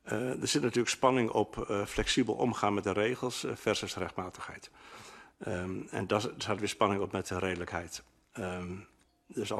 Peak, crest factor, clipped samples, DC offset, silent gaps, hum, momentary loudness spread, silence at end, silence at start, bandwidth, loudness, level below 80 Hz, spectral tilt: -12 dBFS; 22 dB; under 0.1%; under 0.1%; none; none; 16 LU; 0 s; 0.05 s; 13.5 kHz; -32 LUFS; -56 dBFS; -4 dB/octave